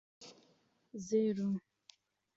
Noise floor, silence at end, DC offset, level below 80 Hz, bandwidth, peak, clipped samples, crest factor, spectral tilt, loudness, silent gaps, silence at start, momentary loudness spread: -72 dBFS; 0.8 s; under 0.1%; -80 dBFS; 7.8 kHz; -22 dBFS; under 0.1%; 18 dB; -8.5 dB/octave; -36 LUFS; none; 0.2 s; 23 LU